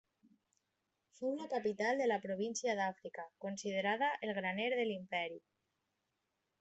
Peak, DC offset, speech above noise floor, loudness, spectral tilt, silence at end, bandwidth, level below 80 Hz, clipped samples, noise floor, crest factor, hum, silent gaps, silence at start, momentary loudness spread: -20 dBFS; under 0.1%; 48 dB; -38 LUFS; -4 dB/octave; 1.2 s; 8.2 kHz; -86 dBFS; under 0.1%; -86 dBFS; 20 dB; none; none; 1.2 s; 10 LU